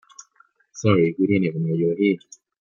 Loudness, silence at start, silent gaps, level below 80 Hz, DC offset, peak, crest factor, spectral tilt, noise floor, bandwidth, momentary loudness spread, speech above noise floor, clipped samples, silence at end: -21 LUFS; 0.75 s; none; -60 dBFS; under 0.1%; -4 dBFS; 18 dB; -7 dB/octave; -60 dBFS; 7.4 kHz; 7 LU; 40 dB; under 0.1%; 0.45 s